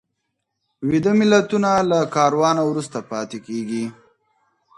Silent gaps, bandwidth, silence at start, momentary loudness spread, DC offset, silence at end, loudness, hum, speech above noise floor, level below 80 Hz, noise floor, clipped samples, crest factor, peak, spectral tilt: none; 11.5 kHz; 0.8 s; 13 LU; under 0.1%; 0.85 s; -19 LUFS; none; 58 dB; -60 dBFS; -76 dBFS; under 0.1%; 20 dB; 0 dBFS; -5.5 dB/octave